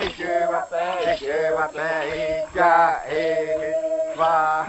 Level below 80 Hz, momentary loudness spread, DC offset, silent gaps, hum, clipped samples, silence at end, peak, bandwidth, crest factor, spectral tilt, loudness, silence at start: -52 dBFS; 7 LU; under 0.1%; none; none; under 0.1%; 0 s; -6 dBFS; 8.4 kHz; 16 dB; -4 dB/octave; -22 LUFS; 0 s